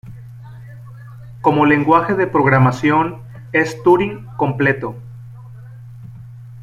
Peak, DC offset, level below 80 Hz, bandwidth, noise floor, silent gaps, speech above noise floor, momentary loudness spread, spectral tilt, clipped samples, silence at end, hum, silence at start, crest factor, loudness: -2 dBFS; under 0.1%; -48 dBFS; 11.5 kHz; -36 dBFS; none; 21 dB; 24 LU; -7.5 dB/octave; under 0.1%; 0 s; none; 0.05 s; 16 dB; -16 LUFS